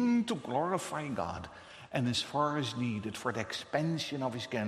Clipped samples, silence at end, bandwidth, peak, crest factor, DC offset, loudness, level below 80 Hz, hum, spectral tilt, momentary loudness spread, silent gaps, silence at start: under 0.1%; 0 s; 13 kHz; -16 dBFS; 18 dB; under 0.1%; -34 LUFS; -64 dBFS; none; -5 dB/octave; 7 LU; none; 0 s